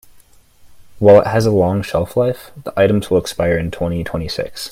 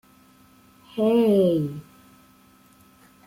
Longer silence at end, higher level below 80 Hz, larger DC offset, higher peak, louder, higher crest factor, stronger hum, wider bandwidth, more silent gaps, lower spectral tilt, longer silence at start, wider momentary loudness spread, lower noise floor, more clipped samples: second, 0 s vs 1.45 s; first, -42 dBFS vs -64 dBFS; neither; first, 0 dBFS vs -10 dBFS; first, -16 LUFS vs -21 LUFS; about the same, 16 dB vs 16 dB; neither; about the same, 16 kHz vs 16.5 kHz; neither; second, -6.5 dB/octave vs -8.5 dB/octave; second, 0.65 s vs 0.95 s; second, 13 LU vs 18 LU; second, -47 dBFS vs -55 dBFS; neither